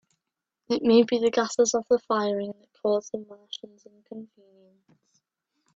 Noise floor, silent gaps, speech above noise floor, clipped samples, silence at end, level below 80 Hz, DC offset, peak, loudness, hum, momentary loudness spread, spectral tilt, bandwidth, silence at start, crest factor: -86 dBFS; none; 60 dB; under 0.1%; 1.5 s; -70 dBFS; under 0.1%; -8 dBFS; -24 LUFS; none; 22 LU; -4 dB/octave; 7.8 kHz; 0.7 s; 20 dB